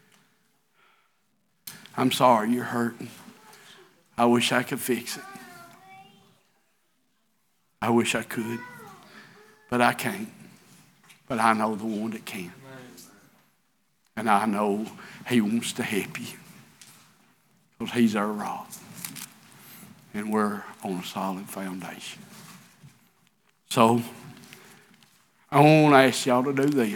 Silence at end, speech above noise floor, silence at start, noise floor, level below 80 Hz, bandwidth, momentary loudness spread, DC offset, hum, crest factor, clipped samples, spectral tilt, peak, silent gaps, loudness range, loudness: 0 s; 48 dB; 1.65 s; -72 dBFS; -72 dBFS; 19 kHz; 24 LU; under 0.1%; none; 24 dB; under 0.1%; -5 dB/octave; -2 dBFS; none; 8 LU; -25 LUFS